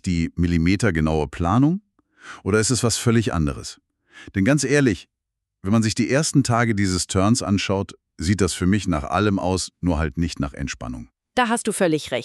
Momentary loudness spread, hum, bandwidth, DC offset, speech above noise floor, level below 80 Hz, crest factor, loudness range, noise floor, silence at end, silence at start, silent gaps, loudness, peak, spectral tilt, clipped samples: 11 LU; none; 13 kHz; under 0.1%; 61 dB; -38 dBFS; 18 dB; 3 LU; -81 dBFS; 0 s; 0.05 s; none; -21 LUFS; -4 dBFS; -5 dB/octave; under 0.1%